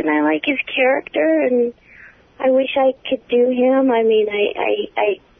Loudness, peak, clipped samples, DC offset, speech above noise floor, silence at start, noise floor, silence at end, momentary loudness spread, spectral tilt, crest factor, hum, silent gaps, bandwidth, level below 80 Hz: -17 LUFS; -6 dBFS; under 0.1%; under 0.1%; 28 dB; 0 s; -45 dBFS; 0.25 s; 5 LU; -7.5 dB/octave; 12 dB; none; none; 3.8 kHz; -60 dBFS